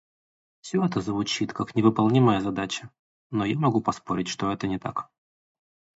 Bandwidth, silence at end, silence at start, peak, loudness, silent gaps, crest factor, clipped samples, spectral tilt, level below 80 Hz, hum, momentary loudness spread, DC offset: 8 kHz; 0.95 s; 0.65 s; -4 dBFS; -26 LUFS; 2.99-3.30 s; 22 dB; under 0.1%; -6 dB/octave; -58 dBFS; none; 12 LU; under 0.1%